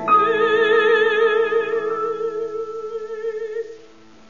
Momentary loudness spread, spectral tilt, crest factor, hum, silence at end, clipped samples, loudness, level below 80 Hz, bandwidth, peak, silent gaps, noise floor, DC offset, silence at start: 14 LU; -4 dB/octave; 14 dB; none; 0.55 s; under 0.1%; -19 LUFS; -68 dBFS; 7.2 kHz; -4 dBFS; none; -47 dBFS; 0.4%; 0 s